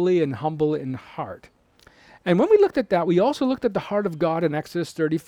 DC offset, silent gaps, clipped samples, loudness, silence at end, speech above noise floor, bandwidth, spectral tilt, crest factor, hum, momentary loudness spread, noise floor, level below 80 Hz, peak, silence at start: under 0.1%; none; under 0.1%; -22 LUFS; 0.05 s; 33 dB; 14 kHz; -7.5 dB/octave; 16 dB; none; 15 LU; -54 dBFS; -58 dBFS; -6 dBFS; 0 s